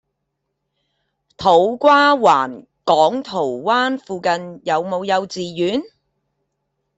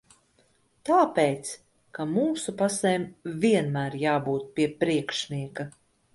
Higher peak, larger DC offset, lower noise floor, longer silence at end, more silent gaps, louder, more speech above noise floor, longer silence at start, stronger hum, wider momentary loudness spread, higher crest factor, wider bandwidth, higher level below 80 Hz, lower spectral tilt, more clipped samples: first, 0 dBFS vs -8 dBFS; neither; first, -75 dBFS vs -65 dBFS; first, 1.1 s vs 0.45 s; neither; first, -17 LUFS vs -26 LUFS; first, 59 dB vs 40 dB; first, 1.4 s vs 0.85 s; neither; second, 10 LU vs 15 LU; about the same, 18 dB vs 18 dB; second, 8.2 kHz vs 11.5 kHz; about the same, -62 dBFS vs -66 dBFS; about the same, -4.5 dB/octave vs -5 dB/octave; neither